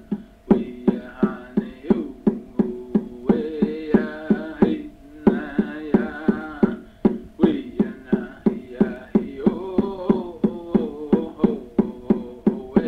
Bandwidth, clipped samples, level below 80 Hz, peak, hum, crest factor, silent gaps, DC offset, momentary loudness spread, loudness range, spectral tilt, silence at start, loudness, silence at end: 4.5 kHz; under 0.1%; -46 dBFS; -2 dBFS; none; 20 dB; none; under 0.1%; 5 LU; 1 LU; -10 dB/octave; 0 s; -23 LUFS; 0 s